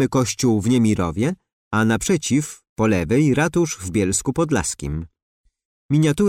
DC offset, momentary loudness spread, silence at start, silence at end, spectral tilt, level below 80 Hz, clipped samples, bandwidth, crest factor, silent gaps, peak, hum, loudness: under 0.1%; 9 LU; 0 s; 0 s; -5.5 dB/octave; -42 dBFS; under 0.1%; 16 kHz; 12 dB; 1.53-1.71 s, 2.69-2.76 s, 5.22-5.44 s, 5.65-5.89 s; -8 dBFS; none; -20 LUFS